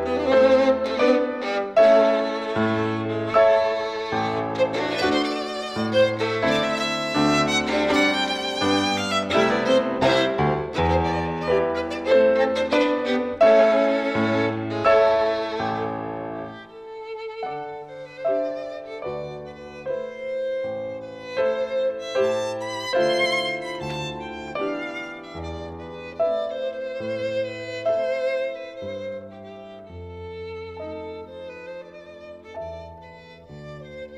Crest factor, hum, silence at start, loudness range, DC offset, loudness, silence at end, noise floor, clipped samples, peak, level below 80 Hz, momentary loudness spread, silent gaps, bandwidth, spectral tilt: 16 dB; none; 0 s; 11 LU; under 0.1%; -22 LUFS; 0 s; -44 dBFS; under 0.1%; -6 dBFS; -52 dBFS; 19 LU; none; 11.5 kHz; -5 dB/octave